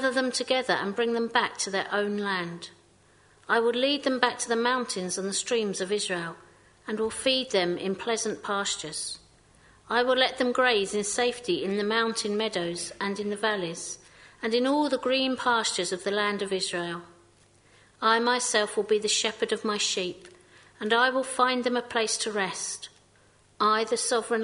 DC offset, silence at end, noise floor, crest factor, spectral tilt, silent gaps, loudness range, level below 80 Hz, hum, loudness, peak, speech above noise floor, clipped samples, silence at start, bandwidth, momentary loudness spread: under 0.1%; 0 s; -60 dBFS; 24 dB; -2.5 dB/octave; none; 3 LU; -68 dBFS; none; -27 LUFS; -4 dBFS; 33 dB; under 0.1%; 0 s; 11 kHz; 10 LU